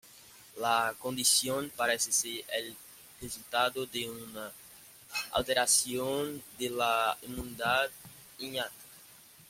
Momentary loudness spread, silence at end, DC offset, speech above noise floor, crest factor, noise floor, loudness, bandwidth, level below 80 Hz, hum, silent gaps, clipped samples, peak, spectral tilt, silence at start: 23 LU; 0.05 s; under 0.1%; 24 dB; 22 dB; -56 dBFS; -30 LUFS; 16.5 kHz; -62 dBFS; none; none; under 0.1%; -12 dBFS; -1 dB/octave; 0.05 s